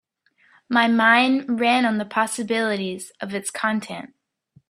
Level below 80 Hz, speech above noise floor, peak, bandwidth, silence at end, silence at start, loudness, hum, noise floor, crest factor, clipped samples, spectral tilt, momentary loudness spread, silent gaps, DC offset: -68 dBFS; 40 dB; -2 dBFS; 14.5 kHz; 0.65 s; 0.7 s; -21 LUFS; none; -61 dBFS; 20 dB; under 0.1%; -3.5 dB/octave; 15 LU; none; under 0.1%